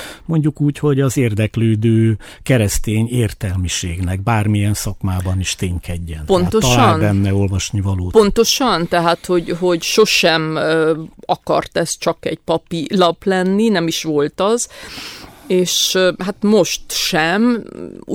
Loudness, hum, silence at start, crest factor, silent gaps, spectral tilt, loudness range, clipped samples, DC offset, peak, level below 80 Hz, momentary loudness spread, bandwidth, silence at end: -16 LUFS; none; 0 s; 16 dB; none; -5 dB/octave; 3 LU; under 0.1%; under 0.1%; 0 dBFS; -36 dBFS; 9 LU; 17 kHz; 0 s